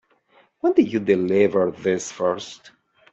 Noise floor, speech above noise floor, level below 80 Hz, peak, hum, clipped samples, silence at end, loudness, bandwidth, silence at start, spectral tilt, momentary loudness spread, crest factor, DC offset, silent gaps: -59 dBFS; 38 dB; -66 dBFS; -4 dBFS; none; under 0.1%; 0.6 s; -21 LUFS; 8.2 kHz; 0.65 s; -5.5 dB/octave; 7 LU; 18 dB; under 0.1%; none